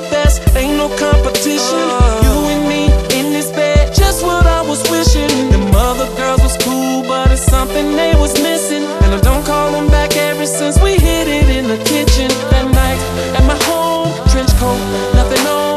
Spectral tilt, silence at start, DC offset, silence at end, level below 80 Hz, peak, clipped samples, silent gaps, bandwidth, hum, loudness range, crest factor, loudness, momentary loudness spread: -5 dB/octave; 0 s; under 0.1%; 0 s; -16 dBFS; 0 dBFS; under 0.1%; none; 14 kHz; none; 1 LU; 12 dB; -13 LUFS; 3 LU